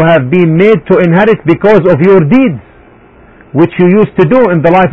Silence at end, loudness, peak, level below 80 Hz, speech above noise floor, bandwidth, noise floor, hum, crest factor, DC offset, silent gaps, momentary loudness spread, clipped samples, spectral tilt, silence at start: 0 s; -7 LUFS; 0 dBFS; -40 dBFS; 32 dB; 5.6 kHz; -38 dBFS; none; 6 dB; under 0.1%; none; 5 LU; 1%; -9.5 dB/octave; 0 s